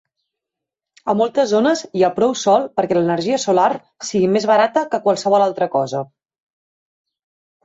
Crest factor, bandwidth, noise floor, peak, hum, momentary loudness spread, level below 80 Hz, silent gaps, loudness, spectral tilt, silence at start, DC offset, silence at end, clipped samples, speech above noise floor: 14 dB; 8 kHz; -84 dBFS; -4 dBFS; none; 8 LU; -64 dBFS; none; -17 LUFS; -5 dB/octave; 1.05 s; under 0.1%; 1.6 s; under 0.1%; 67 dB